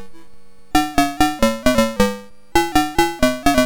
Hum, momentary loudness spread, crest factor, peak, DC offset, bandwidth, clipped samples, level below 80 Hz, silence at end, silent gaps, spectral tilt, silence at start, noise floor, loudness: none; 4 LU; 16 dB; -2 dBFS; under 0.1%; 19 kHz; under 0.1%; -32 dBFS; 0 s; none; -4 dB/octave; 0 s; -45 dBFS; -18 LUFS